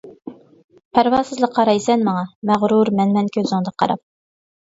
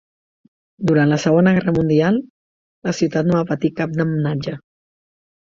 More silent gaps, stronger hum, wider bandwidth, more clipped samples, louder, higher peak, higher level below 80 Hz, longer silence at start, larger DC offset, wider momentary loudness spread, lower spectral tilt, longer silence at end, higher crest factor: second, 0.64-0.69 s, 0.85-0.91 s, 2.35-2.42 s vs 2.30-2.82 s; neither; about the same, 7.8 kHz vs 7.6 kHz; neither; about the same, -18 LUFS vs -18 LUFS; first, 0 dBFS vs -4 dBFS; second, -58 dBFS vs -52 dBFS; second, 0.05 s vs 0.8 s; neither; about the same, 9 LU vs 11 LU; about the same, -6.5 dB/octave vs -7 dB/octave; second, 0.75 s vs 1 s; about the same, 18 dB vs 16 dB